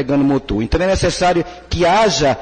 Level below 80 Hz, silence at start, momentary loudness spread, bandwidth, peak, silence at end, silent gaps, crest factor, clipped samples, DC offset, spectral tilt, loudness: -30 dBFS; 0 s; 6 LU; 9.2 kHz; -6 dBFS; 0 s; none; 10 dB; under 0.1%; under 0.1%; -5 dB/octave; -16 LUFS